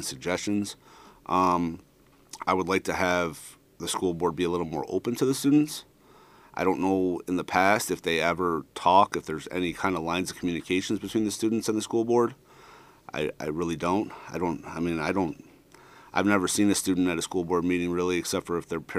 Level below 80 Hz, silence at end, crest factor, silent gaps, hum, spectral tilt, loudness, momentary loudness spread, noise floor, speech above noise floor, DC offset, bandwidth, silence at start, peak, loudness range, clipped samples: -58 dBFS; 0 s; 22 dB; none; none; -4.5 dB/octave; -27 LUFS; 10 LU; -55 dBFS; 29 dB; under 0.1%; 15.5 kHz; 0 s; -4 dBFS; 4 LU; under 0.1%